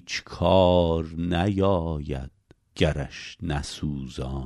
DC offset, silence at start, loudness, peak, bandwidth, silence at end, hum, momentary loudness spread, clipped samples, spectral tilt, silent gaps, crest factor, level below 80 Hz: under 0.1%; 0.05 s; -25 LUFS; -6 dBFS; 11.5 kHz; 0 s; none; 15 LU; under 0.1%; -6.5 dB/octave; none; 18 dB; -38 dBFS